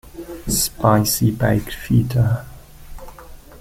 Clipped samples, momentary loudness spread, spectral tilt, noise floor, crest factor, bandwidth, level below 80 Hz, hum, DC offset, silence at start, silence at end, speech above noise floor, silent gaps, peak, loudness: under 0.1%; 14 LU; -5 dB/octave; -39 dBFS; 18 dB; 16.5 kHz; -36 dBFS; none; under 0.1%; 0.05 s; 0.05 s; 22 dB; none; -2 dBFS; -18 LUFS